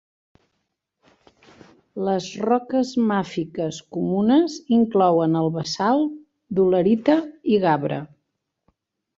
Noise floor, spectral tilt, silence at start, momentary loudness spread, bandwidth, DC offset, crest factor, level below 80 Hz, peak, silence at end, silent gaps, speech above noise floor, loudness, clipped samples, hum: -77 dBFS; -6.5 dB/octave; 1.95 s; 10 LU; 7.8 kHz; under 0.1%; 18 dB; -62 dBFS; -4 dBFS; 1.1 s; none; 57 dB; -21 LUFS; under 0.1%; none